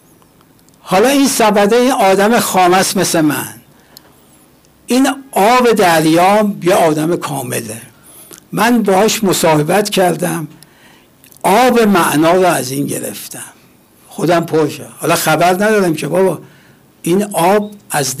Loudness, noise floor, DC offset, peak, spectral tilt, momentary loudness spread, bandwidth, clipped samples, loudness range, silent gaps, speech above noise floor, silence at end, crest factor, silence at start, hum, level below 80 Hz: -12 LUFS; -47 dBFS; under 0.1%; -4 dBFS; -4.5 dB/octave; 12 LU; 16 kHz; under 0.1%; 3 LU; none; 35 dB; 0 s; 8 dB; 0.85 s; none; -52 dBFS